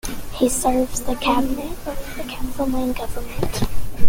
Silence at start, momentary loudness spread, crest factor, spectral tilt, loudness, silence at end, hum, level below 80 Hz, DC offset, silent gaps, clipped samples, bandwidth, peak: 0.05 s; 11 LU; 18 dB; -4.5 dB/octave; -23 LUFS; 0 s; none; -30 dBFS; under 0.1%; none; under 0.1%; 17 kHz; 0 dBFS